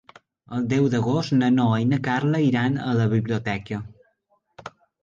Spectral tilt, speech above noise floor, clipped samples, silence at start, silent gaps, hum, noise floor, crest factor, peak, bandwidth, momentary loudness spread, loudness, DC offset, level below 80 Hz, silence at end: -7.5 dB/octave; 47 dB; under 0.1%; 0.5 s; none; none; -68 dBFS; 14 dB; -10 dBFS; 7.6 kHz; 22 LU; -22 LUFS; under 0.1%; -56 dBFS; 0.35 s